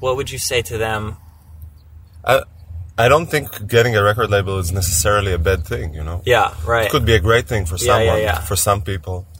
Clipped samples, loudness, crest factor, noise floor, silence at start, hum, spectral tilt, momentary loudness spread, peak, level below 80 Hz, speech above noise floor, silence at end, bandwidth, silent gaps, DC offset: under 0.1%; -17 LUFS; 16 dB; -41 dBFS; 0 s; none; -4 dB/octave; 11 LU; -2 dBFS; -30 dBFS; 25 dB; 0 s; 16.5 kHz; none; under 0.1%